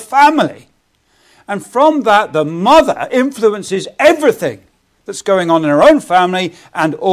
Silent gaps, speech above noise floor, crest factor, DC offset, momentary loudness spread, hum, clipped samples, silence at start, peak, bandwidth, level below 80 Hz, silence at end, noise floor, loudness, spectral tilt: none; 45 dB; 12 dB; under 0.1%; 12 LU; none; under 0.1%; 0 s; 0 dBFS; 15.5 kHz; -50 dBFS; 0 s; -57 dBFS; -12 LUFS; -5 dB/octave